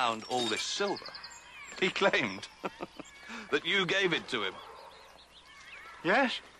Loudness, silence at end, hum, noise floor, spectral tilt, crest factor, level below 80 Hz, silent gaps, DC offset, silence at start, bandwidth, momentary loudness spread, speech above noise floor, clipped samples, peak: -31 LUFS; 0.1 s; none; -55 dBFS; -3 dB/octave; 20 dB; -68 dBFS; none; under 0.1%; 0 s; 13 kHz; 20 LU; 24 dB; under 0.1%; -14 dBFS